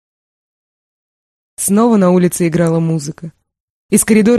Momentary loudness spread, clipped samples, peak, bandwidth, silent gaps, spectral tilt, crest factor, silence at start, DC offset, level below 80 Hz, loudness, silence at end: 15 LU; under 0.1%; 0 dBFS; 13 kHz; 3.60-3.89 s; -6 dB/octave; 14 dB; 1.6 s; under 0.1%; -50 dBFS; -13 LUFS; 0 s